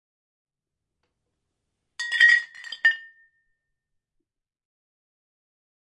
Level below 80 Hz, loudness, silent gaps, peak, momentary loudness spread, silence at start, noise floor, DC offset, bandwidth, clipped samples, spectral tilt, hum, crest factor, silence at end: -84 dBFS; -19 LUFS; none; -6 dBFS; 18 LU; 2 s; -85 dBFS; under 0.1%; 11.5 kHz; under 0.1%; 4 dB/octave; none; 24 dB; 2.85 s